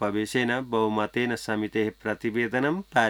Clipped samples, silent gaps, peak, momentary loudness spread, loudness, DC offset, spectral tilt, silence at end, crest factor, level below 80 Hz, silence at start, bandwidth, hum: under 0.1%; none; -6 dBFS; 3 LU; -27 LUFS; under 0.1%; -5.5 dB/octave; 0 s; 20 dB; -60 dBFS; 0 s; 18.5 kHz; none